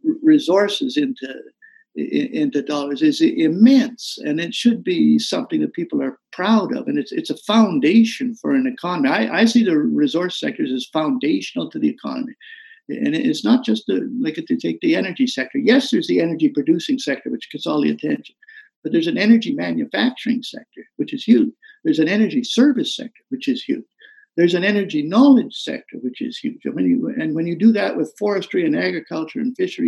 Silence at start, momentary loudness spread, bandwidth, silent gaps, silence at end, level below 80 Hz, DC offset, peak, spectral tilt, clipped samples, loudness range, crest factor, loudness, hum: 0.05 s; 12 LU; 12 kHz; 18.76-18.82 s; 0 s; -78 dBFS; under 0.1%; -2 dBFS; -5.5 dB/octave; under 0.1%; 4 LU; 16 dB; -19 LUFS; none